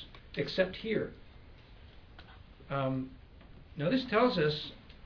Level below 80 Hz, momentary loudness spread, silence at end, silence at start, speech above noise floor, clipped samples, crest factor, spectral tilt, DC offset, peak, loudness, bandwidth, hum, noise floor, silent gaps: -56 dBFS; 17 LU; 0 s; 0 s; 22 dB; under 0.1%; 20 dB; -4.5 dB/octave; under 0.1%; -14 dBFS; -33 LUFS; 5.4 kHz; none; -54 dBFS; none